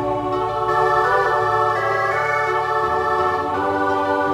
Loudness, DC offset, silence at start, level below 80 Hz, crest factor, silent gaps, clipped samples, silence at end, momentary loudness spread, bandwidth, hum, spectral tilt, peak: -19 LUFS; under 0.1%; 0 s; -48 dBFS; 14 dB; none; under 0.1%; 0 s; 4 LU; 16 kHz; none; -5.5 dB/octave; -6 dBFS